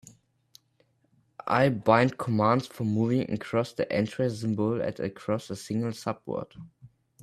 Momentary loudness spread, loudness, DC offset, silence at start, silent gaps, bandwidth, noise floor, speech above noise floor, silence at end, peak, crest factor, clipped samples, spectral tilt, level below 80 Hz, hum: 12 LU; -28 LUFS; under 0.1%; 1.45 s; none; 14 kHz; -69 dBFS; 42 dB; 0.35 s; -6 dBFS; 22 dB; under 0.1%; -7 dB/octave; -64 dBFS; none